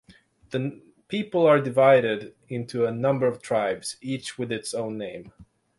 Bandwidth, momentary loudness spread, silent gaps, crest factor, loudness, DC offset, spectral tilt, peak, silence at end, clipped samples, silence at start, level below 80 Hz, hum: 11.5 kHz; 16 LU; none; 20 dB; -25 LUFS; under 0.1%; -5.5 dB/octave; -4 dBFS; 0.35 s; under 0.1%; 0.5 s; -66 dBFS; none